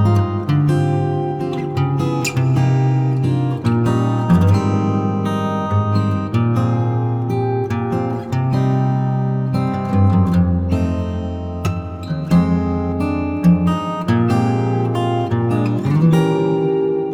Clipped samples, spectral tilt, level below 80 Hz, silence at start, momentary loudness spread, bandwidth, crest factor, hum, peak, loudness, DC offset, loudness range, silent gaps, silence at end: under 0.1%; -8 dB/octave; -40 dBFS; 0 s; 6 LU; 14 kHz; 12 dB; none; -4 dBFS; -18 LUFS; under 0.1%; 2 LU; none; 0 s